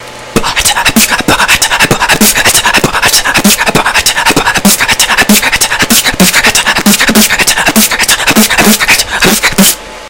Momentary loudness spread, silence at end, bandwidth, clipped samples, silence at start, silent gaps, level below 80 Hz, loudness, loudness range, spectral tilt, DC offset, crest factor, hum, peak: 3 LU; 0 s; over 20 kHz; 4%; 0 s; none; -28 dBFS; -5 LUFS; 1 LU; -2 dB/octave; 0.8%; 8 dB; none; 0 dBFS